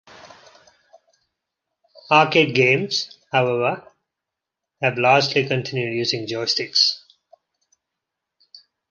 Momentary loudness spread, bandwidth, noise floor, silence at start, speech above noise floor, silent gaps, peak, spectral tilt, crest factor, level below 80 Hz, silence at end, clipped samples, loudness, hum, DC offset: 9 LU; 10 kHz; -84 dBFS; 0.25 s; 65 dB; none; -2 dBFS; -4 dB/octave; 20 dB; -68 dBFS; 1.9 s; under 0.1%; -19 LUFS; none; under 0.1%